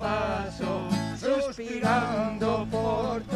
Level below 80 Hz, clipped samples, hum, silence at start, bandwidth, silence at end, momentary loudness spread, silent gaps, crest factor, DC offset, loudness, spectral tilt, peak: -48 dBFS; under 0.1%; none; 0 s; 13 kHz; 0 s; 6 LU; none; 16 dB; under 0.1%; -28 LUFS; -6 dB/octave; -12 dBFS